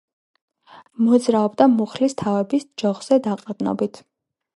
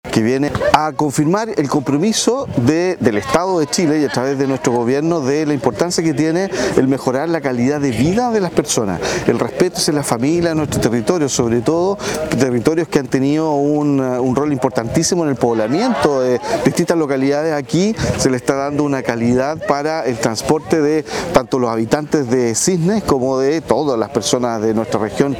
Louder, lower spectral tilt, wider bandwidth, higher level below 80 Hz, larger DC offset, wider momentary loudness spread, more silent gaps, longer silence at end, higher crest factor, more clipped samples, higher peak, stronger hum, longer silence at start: second, -20 LUFS vs -16 LUFS; first, -6.5 dB/octave vs -5 dB/octave; second, 11.5 kHz vs 18 kHz; second, -66 dBFS vs -44 dBFS; neither; first, 9 LU vs 3 LU; neither; first, 0.6 s vs 0 s; about the same, 20 dB vs 16 dB; neither; about the same, -2 dBFS vs 0 dBFS; neither; first, 1 s vs 0.05 s